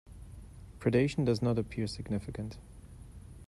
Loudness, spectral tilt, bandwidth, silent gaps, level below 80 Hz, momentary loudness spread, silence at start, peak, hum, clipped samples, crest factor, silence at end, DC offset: -33 LUFS; -7 dB/octave; 12 kHz; none; -52 dBFS; 23 LU; 0.05 s; -14 dBFS; none; under 0.1%; 20 dB; 0.05 s; under 0.1%